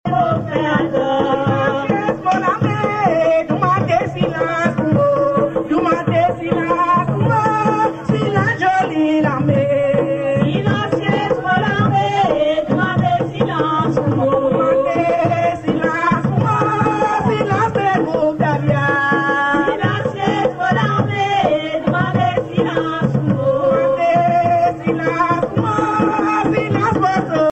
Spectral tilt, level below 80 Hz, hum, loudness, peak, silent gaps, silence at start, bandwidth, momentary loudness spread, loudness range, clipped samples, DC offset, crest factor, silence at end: -7.5 dB/octave; -46 dBFS; none; -16 LUFS; -2 dBFS; none; 0.05 s; 8.4 kHz; 3 LU; 1 LU; under 0.1%; under 0.1%; 14 dB; 0 s